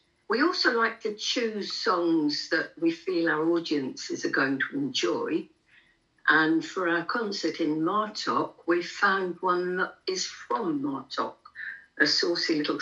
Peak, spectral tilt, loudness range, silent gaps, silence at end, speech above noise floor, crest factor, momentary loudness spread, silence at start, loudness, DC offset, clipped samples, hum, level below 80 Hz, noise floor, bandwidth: -8 dBFS; -3.5 dB/octave; 2 LU; none; 0 s; 36 dB; 20 dB; 8 LU; 0.3 s; -27 LUFS; under 0.1%; under 0.1%; none; -76 dBFS; -63 dBFS; 7.8 kHz